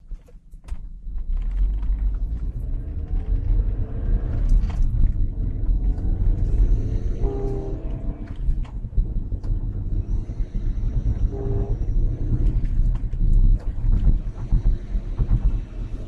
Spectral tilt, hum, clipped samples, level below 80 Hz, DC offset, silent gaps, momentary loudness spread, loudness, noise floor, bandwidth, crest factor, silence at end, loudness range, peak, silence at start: -10 dB/octave; none; under 0.1%; -22 dBFS; under 0.1%; none; 8 LU; -27 LUFS; -42 dBFS; 2.3 kHz; 14 dB; 0 s; 4 LU; -8 dBFS; 0.05 s